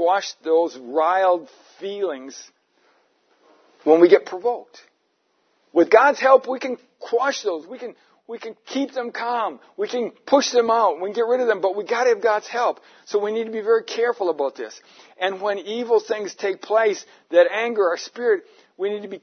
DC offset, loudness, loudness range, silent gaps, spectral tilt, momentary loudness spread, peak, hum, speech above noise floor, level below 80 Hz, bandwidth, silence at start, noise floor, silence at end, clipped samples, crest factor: under 0.1%; -21 LUFS; 5 LU; none; -3 dB/octave; 16 LU; 0 dBFS; none; 47 dB; -82 dBFS; 6.6 kHz; 0 s; -68 dBFS; 0.05 s; under 0.1%; 22 dB